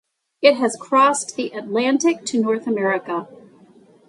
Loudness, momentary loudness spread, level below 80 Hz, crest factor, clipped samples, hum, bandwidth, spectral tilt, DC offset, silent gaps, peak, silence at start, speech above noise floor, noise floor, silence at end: -19 LUFS; 10 LU; -74 dBFS; 20 dB; under 0.1%; none; 11.5 kHz; -3.5 dB/octave; under 0.1%; none; 0 dBFS; 0.4 s; 31 dB; -50 dBFS; 0.75 s